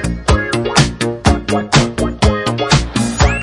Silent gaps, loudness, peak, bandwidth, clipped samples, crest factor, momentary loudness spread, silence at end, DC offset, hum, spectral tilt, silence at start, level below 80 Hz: none; -14 LUFS; 0 dBFS; 11.5 kHz; under 0.1%; 14 dB; 4 LU; 0 s; under 0.1%; none; -4.5 dB/octave; 0 s; -22 dBFS